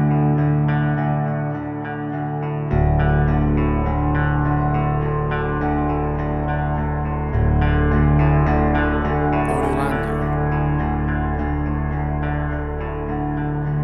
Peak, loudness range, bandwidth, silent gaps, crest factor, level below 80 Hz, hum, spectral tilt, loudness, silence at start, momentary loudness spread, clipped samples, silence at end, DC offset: -6 dBFS; 3 LU; 4 kHz; none; 12 dB; -26 dBFS; none; -9.5 dB/octave; -20 LUFS; 0 s; 7 LU; under 0.1%; 0 s; under 0.1%